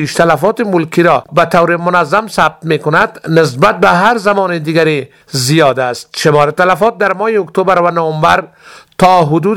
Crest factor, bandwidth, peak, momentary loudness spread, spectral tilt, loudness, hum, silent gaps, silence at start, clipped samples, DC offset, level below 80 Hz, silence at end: 10 dB; 18 kHz; 0 dBFS; 5 LU; -5.5 dB/octave; -11 LUFS; none; none; 0 s; 0.5%; 0.4%; -46 dBFS; 0 s